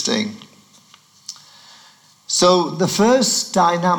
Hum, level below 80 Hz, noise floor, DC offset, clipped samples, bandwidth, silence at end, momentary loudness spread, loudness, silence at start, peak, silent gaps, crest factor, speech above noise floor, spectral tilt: none; -60 dBFS; -51 dBFS; under 0.1%; under 0.1%; 19 kHz; 0 s; 21 LU; -16 LUFS; 0 s; -2 dBFS; none; 18 dB; 34 dB; -3.5 dB/octave